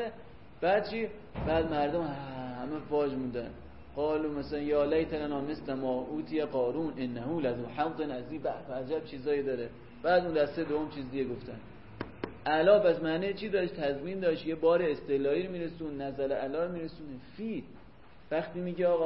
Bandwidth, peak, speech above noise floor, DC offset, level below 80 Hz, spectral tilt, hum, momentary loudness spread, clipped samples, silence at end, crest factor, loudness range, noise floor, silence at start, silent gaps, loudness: 5.8 kHz; -12 dBFS; 24 dB; 0.2%; -56 dBFS; -10 dB/octave; none; 12 LU; under 0.1%; 0 s; 20 dB; 5 LU; -56 dBFS; 0 s; none; -32 LUFS